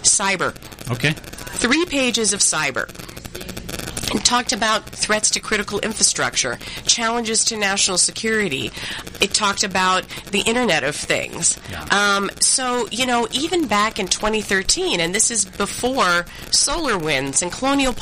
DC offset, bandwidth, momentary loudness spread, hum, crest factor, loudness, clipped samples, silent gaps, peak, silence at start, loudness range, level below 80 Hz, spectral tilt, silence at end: under 0.1%; 15.5 kHz; 10 LU; none; 20 dB; -18 LUFS; under 0.1%; none; 0 dBFS; 0 s; 2 LU; -42 dBFS; -1.5 dB/octave; 0 s